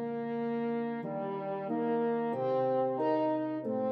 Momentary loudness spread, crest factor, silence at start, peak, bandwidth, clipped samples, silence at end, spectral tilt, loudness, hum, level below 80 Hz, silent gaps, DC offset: 6 LU; 14 dB; 0 s; -18 dBFS; 5.6 kHz; under 0.1%; 0 s; -9.5 dB/octave; -33 LUFS; none; -88 dBFS; none; under 0.1%